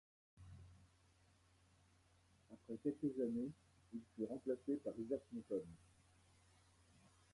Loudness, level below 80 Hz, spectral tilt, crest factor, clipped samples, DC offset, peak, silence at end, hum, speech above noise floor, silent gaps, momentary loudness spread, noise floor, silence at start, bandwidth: -46 LUFS; -76 dBFS; -8 dB/octave; 20 dB; under 0.1%; under 0.1%; -30 dBFS; 1.55 s; none; 28 dB; none; 22 LU; -74 dBFS; 0.35 s; 11.5 kHz